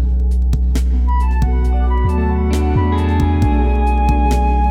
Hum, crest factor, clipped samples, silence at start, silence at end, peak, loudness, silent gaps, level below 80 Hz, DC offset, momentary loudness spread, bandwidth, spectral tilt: none; 10 dB; under 0.1%; 0 s; 0 s; -2 dBFS; -16 LUFS; none; -14 dBFS; under 0.1%; 2 LU; 8.6 kHz; -8 dB/octave